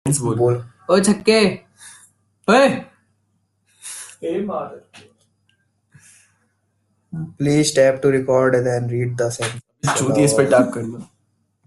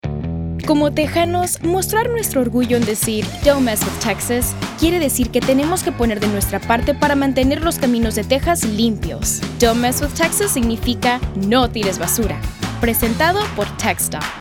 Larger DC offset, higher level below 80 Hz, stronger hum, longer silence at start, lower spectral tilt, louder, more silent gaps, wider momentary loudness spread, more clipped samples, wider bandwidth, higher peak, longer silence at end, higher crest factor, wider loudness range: neither; second, -56 dBFS vs -32 dBFS; neither; about the same, 0.05 s vs 0.05 s; about the same, -5 dB/octave vs -4 dB/octave; about the same, -18 LUFS vs -17 LUFS; neither; first, 18 LU vs 4 LU; neither; second, 12.5 kHz vs 19 kHz; about the same, -2 dBFS vs -2 dBFS; first, 0.6 s vs 0 s; about the same, 18 dB vs 16 dB; first, 14 LU vs 1 LU